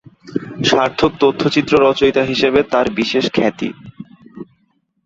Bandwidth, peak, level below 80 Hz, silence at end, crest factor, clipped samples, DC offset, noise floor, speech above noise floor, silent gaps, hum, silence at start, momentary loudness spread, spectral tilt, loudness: 7.8 kHz; 0 dBFS; -46 dBFS; 0.6 s; 16 dB; under 0.1%; under 0.1%; -63 dBFS; 48 dB; none; none; 0.25 s; 14 LU; -5 dB/octave; -15 LUFS